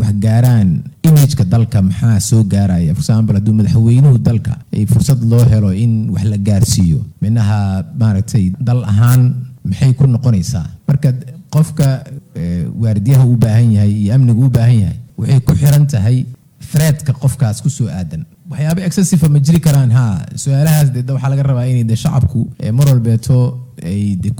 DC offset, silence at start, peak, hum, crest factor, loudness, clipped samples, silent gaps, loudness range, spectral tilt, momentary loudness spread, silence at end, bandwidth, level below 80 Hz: under 0.1%; 0 s; -2 dBFS; none; 10 dB; -13 LUFS; under 0.1%; none; 3 LU; -7 dB/octave; 9 LU; 0 s; over 20 kHz; -38 dBFS